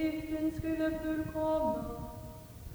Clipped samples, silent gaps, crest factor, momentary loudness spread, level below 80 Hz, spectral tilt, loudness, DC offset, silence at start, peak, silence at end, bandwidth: under 0.1%; none; 14 dB; 15 LU; -50 dBFS; -7 dB/octave; -34 LUFS; under 0.1%; 0 s; -22 dBFS; 0 s; over 20 kHz